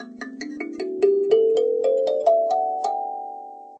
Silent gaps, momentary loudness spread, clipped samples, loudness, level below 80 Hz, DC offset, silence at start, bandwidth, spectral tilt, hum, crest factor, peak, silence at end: none; 16 LU; under 0.1%; -21 LUFS; -78 dBFS; under 0.1%; 0 s; 8.4 kHz; -4 dB/octave; none; 16 dB; -6 dBFS; 0 s